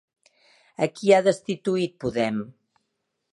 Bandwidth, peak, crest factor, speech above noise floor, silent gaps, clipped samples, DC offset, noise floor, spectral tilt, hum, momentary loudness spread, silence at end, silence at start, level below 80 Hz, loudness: 11.5 kHz; -4 dBFS; 20 dB; 55 dB; none; under 0.1%; under 0.1%; -78 dBFS; -5.5 dB/octave; none; 14 LU; 0.85 s; 0.8 s; -62 dBFS; -24 LUFS